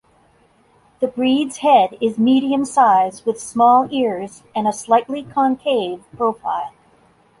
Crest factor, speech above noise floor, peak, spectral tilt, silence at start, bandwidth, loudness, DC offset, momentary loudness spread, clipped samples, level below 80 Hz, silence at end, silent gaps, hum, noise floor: 16 dB; 38 dB; -2 dBFS; -4.5 dB/octave; 1 s; 11.5 kHz; -18 LUFS; under 0.1%; 11 LU; under 0.1%; -62 dBFS; 0.7 s; none; none; -55 dBFS